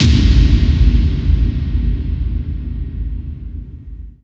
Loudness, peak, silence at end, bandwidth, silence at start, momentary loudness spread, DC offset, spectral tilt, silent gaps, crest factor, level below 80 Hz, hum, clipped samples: -16 LUFS; 0 dBFS; 0.15 s; 7.4 kHz; 0 s; 19 LU; under 0.1%; -7 dB/octave; none; 14 dB; -16 dBFS; none; under 0.1%